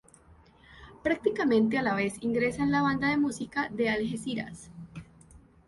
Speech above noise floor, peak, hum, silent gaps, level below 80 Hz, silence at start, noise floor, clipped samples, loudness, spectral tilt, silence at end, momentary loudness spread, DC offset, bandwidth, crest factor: 29 dB; -12 dBFS; none; none; -58 dBFS; 0.7 s; -57 dBFS; under 0.1%; -28 LUFS; -5.5 dB/octave; 0.3 s; 19 LU; under 0.1%; 11.5 kHz; 18 dB